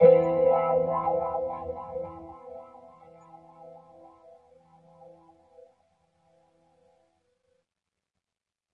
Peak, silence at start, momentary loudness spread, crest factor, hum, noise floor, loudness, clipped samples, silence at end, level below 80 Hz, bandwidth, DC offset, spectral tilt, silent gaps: -6 dBFS; 0 s; 28 LU; 22 dB; none; under -90 dBFS; -26 LUFS; under 0.1%; 5.05 s; -64 dBFS; 3.6 kHz; under 0.1%; -10 dB/octave; none